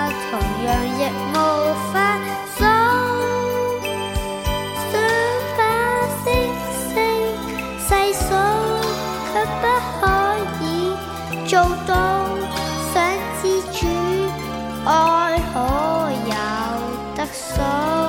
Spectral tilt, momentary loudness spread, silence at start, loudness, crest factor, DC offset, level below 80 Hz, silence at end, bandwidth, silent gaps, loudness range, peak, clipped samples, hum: -4.5 dB/octave; 7 LU; 0 s; -20 LUFS; 18 dB; under 0.1%; -34 dBFS; 0 s; 17 kHz; none; 1 LU; -2 dBFS; under 0.1%; none